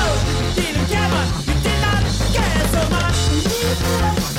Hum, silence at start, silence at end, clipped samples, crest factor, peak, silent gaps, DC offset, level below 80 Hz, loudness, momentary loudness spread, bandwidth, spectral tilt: none; 0 s; 0 s; under 0.1%; 10 dB; -8 dBFS; none; under 0.1%; -24 dBFS; -18 LUFS; 2 LU; 17 kHz; -4.5 dB/octave